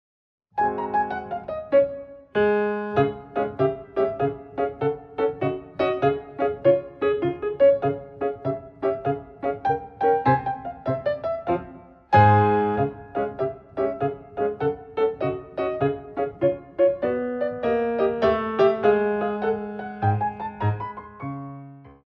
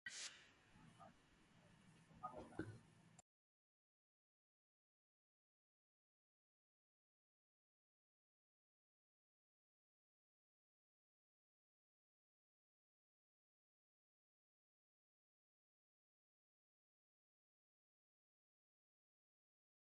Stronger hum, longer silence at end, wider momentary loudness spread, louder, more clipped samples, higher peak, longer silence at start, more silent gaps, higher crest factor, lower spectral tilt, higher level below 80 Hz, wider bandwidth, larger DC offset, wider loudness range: neither; second, 0.15 s vs 16.8 s; second, 10 LU vs 16 LU; first, -24 LUFS vs -57 LUFS; neither; first, -4 dBFS vs -36 dBFS; first, 0.55 s vs 0.05 s; neither; second, 20 dB vs 32 dB; first, -9.5 dB/octave vs -3 dB/octave; first, -54 dBFS vs -86 dBFS; second, 5.8 kHz vs 11 kHz; neither; about the same, 3 LU vs 5 LU